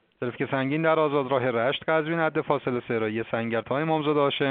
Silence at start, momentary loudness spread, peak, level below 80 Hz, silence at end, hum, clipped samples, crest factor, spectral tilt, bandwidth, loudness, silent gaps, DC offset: 0.2 s; 5 LU; -8 dBFS; -68 dBFS; 0 s; none; under 0.1%; 18 dB; -4 dB/octave; 4.6 kHz; -25 LUFS; none; under 0.1%